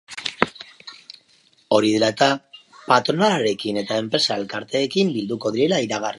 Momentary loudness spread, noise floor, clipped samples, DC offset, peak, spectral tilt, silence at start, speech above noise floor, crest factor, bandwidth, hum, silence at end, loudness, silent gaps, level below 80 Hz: 19 LU; -58 dBFS; under 0.1%; under 0.1%; 0 dBFS; -4.5 dB/octave; 0.1 s; 38 dB; 22 dB; 11.5 kHz; none; 0 s; -21 LUFS; none; -64 dBFS